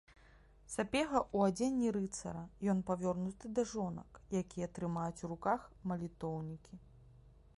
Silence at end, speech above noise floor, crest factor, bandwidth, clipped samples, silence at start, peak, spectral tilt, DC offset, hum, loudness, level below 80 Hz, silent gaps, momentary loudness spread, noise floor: 0.4 s; 25 dB; 20 dB; 11.5 kHz; under 0.1%; 0.1 s; -18 dBFS; -6 dB/octave; under 0.1%; none; -38 LUFS; -62 dBFS; none; 11 LU; -63 dBFS